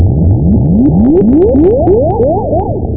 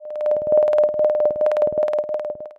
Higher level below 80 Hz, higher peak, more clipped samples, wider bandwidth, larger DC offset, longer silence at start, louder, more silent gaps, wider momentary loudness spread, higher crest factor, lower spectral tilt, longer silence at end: first, -18 dBFS vs -60 dBFS; first, 0 dBFS vs -6 dBFS; neither; second, 2.7 kHz vs 4.6 kHz; first, 4% vs under 0.1%; about the same, 0 s vs 0 s; first, -9 LUFS vs -19 LUFS; neither; about the same, 5 LU vs 7 LU; second, 8 dB vs 14 dB; first, -15 dB/octave vs -6.5 dB/octave; about the same, 0 s vs 0.1 s